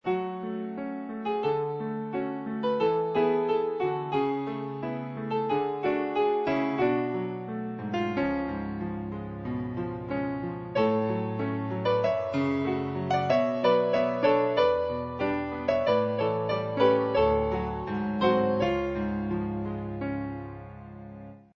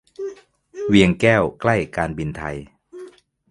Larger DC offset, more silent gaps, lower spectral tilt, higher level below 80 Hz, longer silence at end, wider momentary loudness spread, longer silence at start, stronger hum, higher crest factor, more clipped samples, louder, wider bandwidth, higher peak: neither; neither; first, -8 dB/octave vs -6.5 dB/octave; second, -52 dBFS vs -44 dBFS; second, 0.15 s vs 0.4 s; second, 10 LU vs 22 LU; second, 0.05 s vs 0.2 s; neither; about the same, 18 dB vs 22 dB; neither; second, -28 LUFS vs -19 LUFS; second, 6.6 kHz vs 11.5 kHz; second, -10 dBFS vs 0 dBFS